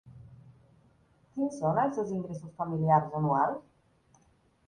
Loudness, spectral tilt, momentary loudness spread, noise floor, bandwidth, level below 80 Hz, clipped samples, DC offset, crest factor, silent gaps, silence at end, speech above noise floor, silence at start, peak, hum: -30 LUFS; -9 dB/octave; 13 LU; -67 dBFS; 10 kHz; -66 dBFS; under 0.1%; under 0.1%; 20 dB; none; 1.1 s; 38 dB; 0.05 s; -12 dBFS; none